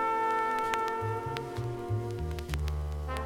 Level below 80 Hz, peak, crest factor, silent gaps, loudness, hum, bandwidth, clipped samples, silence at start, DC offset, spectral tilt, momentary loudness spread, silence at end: -40 dBFS; -12 dBFS; 20 dB; none; -33 LUFS; none; 16.5 kHz; under 0.1%; 0 s; under 0.1%; -6 dB/octave; 7 LU; 0 s